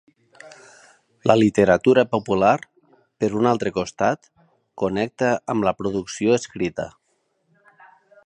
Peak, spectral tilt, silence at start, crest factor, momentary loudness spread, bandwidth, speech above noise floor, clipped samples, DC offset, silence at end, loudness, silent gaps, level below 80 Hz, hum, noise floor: -2 dBFS; -6 dB/octave; 0.45 s; 20 dB; 10 LU; 10 kHz; 50 dB; under 0.1%; under 0.1%; 1.4 s; -21 LUFS; none; -54 dBFS; none; -69 dBFS